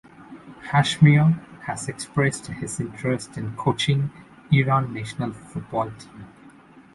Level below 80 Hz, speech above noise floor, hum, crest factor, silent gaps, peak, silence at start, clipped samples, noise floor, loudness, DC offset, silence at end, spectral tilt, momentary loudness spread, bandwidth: -54 dBFS; 27 dB; none; 20 dB; none; -4 dBFS; 0.2 s; under 0.1%; -49 dBFS; -23 LUFS; under 0.1%; 0.45 s; -6 dB/octave; 16 LU; 11.5 kHz